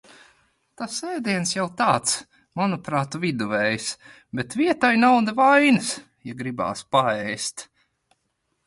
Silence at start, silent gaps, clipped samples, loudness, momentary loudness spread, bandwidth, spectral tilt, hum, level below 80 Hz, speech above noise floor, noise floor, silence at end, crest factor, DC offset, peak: 0.8 s; none; under 0.1%; -22 LUFS; 16 LU; 11.5 kHz; -4 dB/octave; none; -62 dBFS; 52 dB; -74 dBFS; 1.05 s; 18 dB; under 0.1%; -6 dBFS